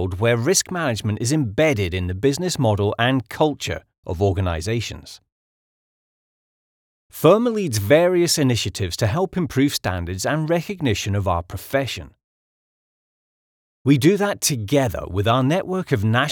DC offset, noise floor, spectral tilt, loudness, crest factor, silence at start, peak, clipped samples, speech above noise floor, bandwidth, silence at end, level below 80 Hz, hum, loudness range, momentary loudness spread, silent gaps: under 0.1%; under -90 dBFS; -5 dB/octave; -20 LUFS; 20 dB; 0 s; -2 dBFS; under 0.1%; over 70 dB; 19.5 kHz; 0 s; -46 dBFS; none; 6 LU; 9 LU; 3.98-4.03 s, 5.32-7.10 s, 12.24-13.85 s